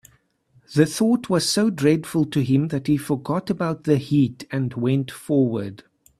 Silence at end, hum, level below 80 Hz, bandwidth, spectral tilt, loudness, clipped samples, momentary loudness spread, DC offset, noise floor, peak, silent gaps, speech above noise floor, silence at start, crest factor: 0.45 s; none; -58 dBFS; 13.5 kHz; -6 dB/octave; -22 LUFS; under 0.1%; 6 LU; under 0.1%; -60 dBFS; -2 dBFS; none; 39 dB; 0.7 s; 20 dB